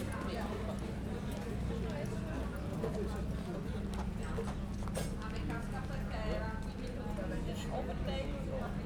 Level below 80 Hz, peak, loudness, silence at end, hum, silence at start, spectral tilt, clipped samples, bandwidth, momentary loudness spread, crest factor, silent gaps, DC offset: -44 dBFS; -24 dBFS; -40 LUFS; 0 s; none; 0 s; -6.5 dB/octave; under 0.1%; 18 kHz; 2 LU; 14 dB; none; under 0.1%